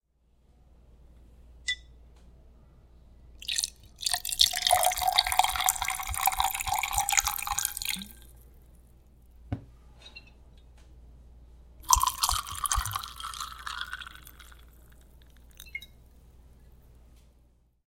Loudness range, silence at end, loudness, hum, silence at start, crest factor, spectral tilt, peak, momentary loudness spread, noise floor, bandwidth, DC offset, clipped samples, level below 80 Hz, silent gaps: 23 LU; 1.45 s; -28 LUFS; none; 1.4 s; 32 dB; 0 dB/octave; -2 dBFS; 20 LU; -65 dBFS; 17 kHz; under 0.1%; under 0.1%; -46 dBFS; none